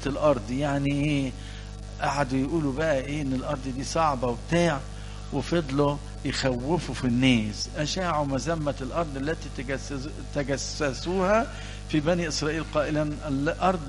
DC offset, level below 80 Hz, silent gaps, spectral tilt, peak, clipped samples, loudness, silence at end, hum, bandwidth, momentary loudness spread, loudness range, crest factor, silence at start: under 0.1%; -40 dBFS; none; -5.5 dB/octave; -6 dBFS; under 0.1%; -27 LUFS; 0 s; 50 Hz at -40 dBFS; 11.5 kHz; 9 LU; 3 LU; 20 dB; 0 s